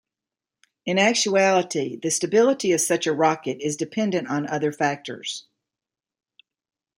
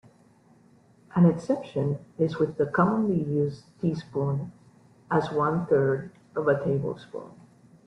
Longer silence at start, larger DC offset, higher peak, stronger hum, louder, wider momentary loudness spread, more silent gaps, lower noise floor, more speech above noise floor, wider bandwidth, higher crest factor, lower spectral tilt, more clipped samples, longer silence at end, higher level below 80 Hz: second, 0.85 s vs 1.15 s; neither; about the same, -6 dBFS vs -8 dBFS; neither; first, -22 LUFS vs -26 LUFS; about the same, 12 LU vs 11 LU; neither; first, -89 dBFS vs -58 dBFS; first, 67 dB vs 33 dB; first, 16 kHz vs 8.6 kHz; about the same, 18 dB vs 18 dB; second, -3.5 dB/octave vs -9 dB/octave; neither; first, 1.6 s vs 0.55 s; second, -72 dBFS vs -62 dBFS